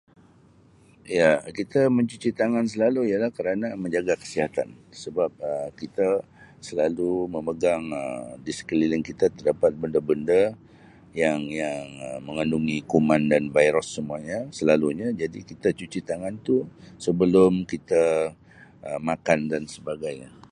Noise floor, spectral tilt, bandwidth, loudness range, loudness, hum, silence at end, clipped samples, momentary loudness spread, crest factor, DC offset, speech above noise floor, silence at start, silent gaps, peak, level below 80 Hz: -55 dBFS; -6 dB/octave; 11 kHz; 4 LU; -25 LUFS; none; 0.2 s; under 0.1%; 12 LU; 20 dB; under 0.1%; 31 dB; 1.05 s; none; -4 dBFS; -56 dBFS